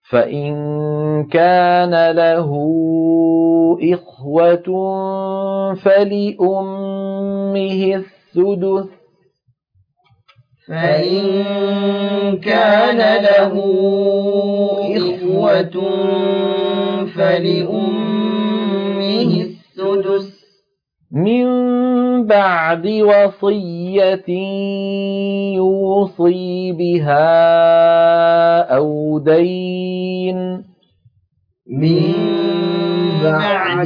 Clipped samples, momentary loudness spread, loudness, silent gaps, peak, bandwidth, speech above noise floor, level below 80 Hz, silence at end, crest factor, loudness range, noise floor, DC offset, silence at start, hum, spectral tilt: under 0.1%; 9 LU; -15 LUFS; none; -2 dBFS; 5.2 kHz; 51 dB; -64 dBFS; 0 s; 14 dB; 7 LU; -66 dBFS; under 0.1%; 0.1 s; none; -9 dB/octave